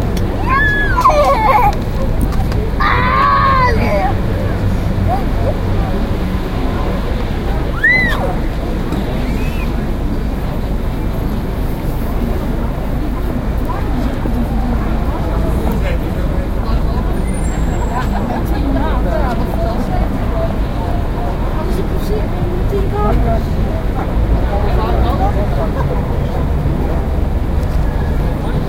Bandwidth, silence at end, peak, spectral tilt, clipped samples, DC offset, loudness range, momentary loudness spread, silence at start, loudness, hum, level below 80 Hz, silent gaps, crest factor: 16 kHz; 0 s; 0 dBFS; -7 dB/octave; under 0.1%; under 0.1%; 6 LU; 8 LU; 0 s; -17 LUFS; none; -18 dBFS; none; 14 dB